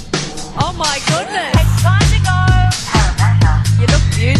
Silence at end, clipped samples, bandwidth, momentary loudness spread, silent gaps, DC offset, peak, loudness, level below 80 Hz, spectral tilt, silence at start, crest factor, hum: 0 s; under 0.1%; 13.5 kHz; 8 LU; none; under 0.1%; 0 dBFS; -14 LUFS; -20 dBFS; -4.5 dB/octave; 0 s; 12 dB; none